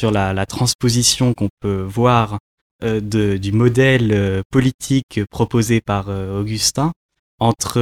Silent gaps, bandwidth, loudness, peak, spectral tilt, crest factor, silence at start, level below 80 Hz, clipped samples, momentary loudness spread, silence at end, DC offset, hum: 0.75-0.79 s, 1.50-1.57 s, 2.40-2.79 s, 4.45-4.50 s, 4.74-4.79 s, 5.03-5.09 s, 6.96-7.09 s, 7.19-7.38 s; 16 kHz; -17 LUFS; -2 dBFS; -5 dB/octave; 16 dB; 0 s; -42 dBFS; under 0.1%; 9 LU; 0 s; under 0.1%; none